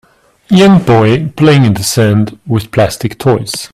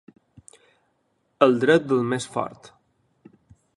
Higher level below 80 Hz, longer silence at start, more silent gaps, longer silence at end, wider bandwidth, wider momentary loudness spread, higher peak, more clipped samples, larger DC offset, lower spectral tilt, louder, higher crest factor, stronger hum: first, -40 dBFS vs -66 dBFS; second, 0.5 s vs 1.4 s; neither; second, 0.1 s vs 1.25 s; first, 15.5 kHz vs 11.5 kHz; second, 8 LU vs 12 LU; about the same, 0 dBFS vs -2 dBFS; neither; neither; about the same, -6 dB/octave vs -5.5 dB/octave; first, -10 LUFS vs -22 LUFS; second, 10 dB vs 24 dB; neither